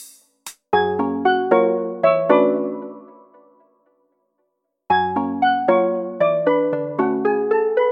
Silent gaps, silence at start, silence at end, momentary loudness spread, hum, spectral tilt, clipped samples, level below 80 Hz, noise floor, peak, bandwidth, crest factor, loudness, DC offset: none; 0 s; 0 s; 9 LU; none; -6 dB/octave; under 0.1%; -66 dBFS; -73 dBFS; -2 dBFS; 15.5 kHz; 18 dB; -19 LUFS; under 0.1%